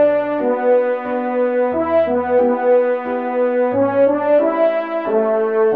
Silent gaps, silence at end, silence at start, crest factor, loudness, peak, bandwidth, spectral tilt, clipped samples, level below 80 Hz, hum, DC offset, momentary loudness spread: none; 0 s; 0 s; 12 dB; -17 LUFS; -4 dBFS; 4.5 kHz; -9 dB/octave; under 0.1%; -60 dBFS; none; 0.2%; 5 LU